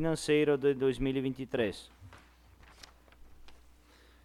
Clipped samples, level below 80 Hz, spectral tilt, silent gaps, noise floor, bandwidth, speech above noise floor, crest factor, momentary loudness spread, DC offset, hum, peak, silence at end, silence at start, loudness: under 0.1%; -54 dBFS; -6 dB/octave; none; -60 dBFS; 13.5 kHz; 30 dB; 16 dB; 25 LU; under 0.1%; none; -18 dBFS; 0.7 s; 0 s; -31 LUFS